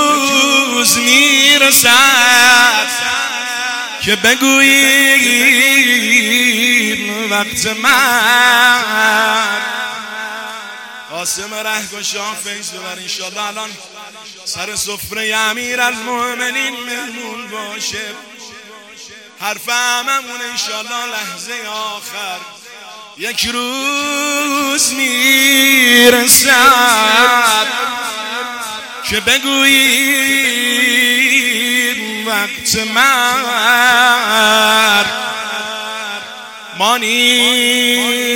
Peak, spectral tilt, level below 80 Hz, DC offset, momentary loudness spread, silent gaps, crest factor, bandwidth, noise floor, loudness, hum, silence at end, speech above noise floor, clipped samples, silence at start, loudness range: 0 dBFS; 0 dB/octave; -54 dBFS; under 0.1%; 17 LU; none; 14 dB; over 20 kHz; -36 dBFS; -11 LUFS; none; 0 s; 22 dB; under 0.1%; 0 s; 13 LU